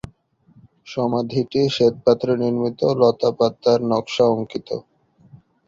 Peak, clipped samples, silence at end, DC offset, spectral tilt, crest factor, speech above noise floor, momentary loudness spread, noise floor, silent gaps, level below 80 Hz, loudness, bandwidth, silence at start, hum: -2 dBFS; under 0.1%; 0.3 s; under 0.1%; -6.5 dB/octave; 18 dB; 36 dB; 10 LU; -55 dBFS; none; -56 dBFS; -19 LUFS; 7.6 kHz; 0.85 s; none